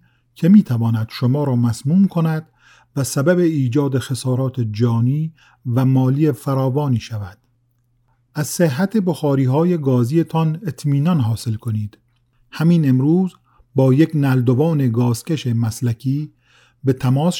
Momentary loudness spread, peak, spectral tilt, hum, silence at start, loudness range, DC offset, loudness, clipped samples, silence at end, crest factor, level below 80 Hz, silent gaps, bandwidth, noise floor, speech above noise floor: 10 LU; -2 dBFS; -7.5 dB/octave; none; 0.4 s; 3 LU; under 0.1%; -18 LUFS; under 0.1%; 0 s; 16 dB; -56 dBFS; none; 17 kHz; -62 dBFS; 45 dB